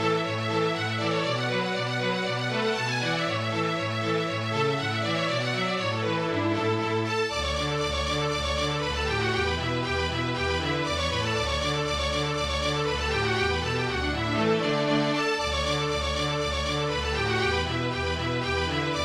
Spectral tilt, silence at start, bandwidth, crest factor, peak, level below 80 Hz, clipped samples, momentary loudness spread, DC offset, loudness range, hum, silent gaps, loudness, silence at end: -4.5 dB/octave; 0 s; 14.5 kHz; 14 dB; -12 dBFS; -40 dBFS; under 0.1%; 2 LU; under 0.1%; 1 LU; none; none; -26 LUFS; 0 s